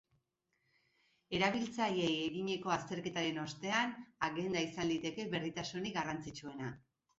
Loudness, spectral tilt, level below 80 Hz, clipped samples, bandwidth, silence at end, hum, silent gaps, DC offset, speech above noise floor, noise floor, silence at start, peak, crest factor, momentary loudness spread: -38 LUFS; -3 dB/octave; -70 dBFS; under 0.1%; 8 kHz; 0.4 s; none; none; under 0.1%; 45 dB; -83 dBFS; 1.3 s; -18 dBFS; 20 dB; 10 LU